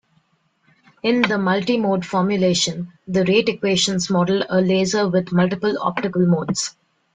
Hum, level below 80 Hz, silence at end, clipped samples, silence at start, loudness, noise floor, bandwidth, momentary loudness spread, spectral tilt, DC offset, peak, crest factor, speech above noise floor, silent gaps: none; -58 dBFS; 0.45 s; under 0.1%; 1.05 s; -19 LUFS; -64 dBFS; 9.4 kHz; 5 LU; -5 dB/octave; under 0.1%; -2 dBFS; 18 dB; 45 dB; none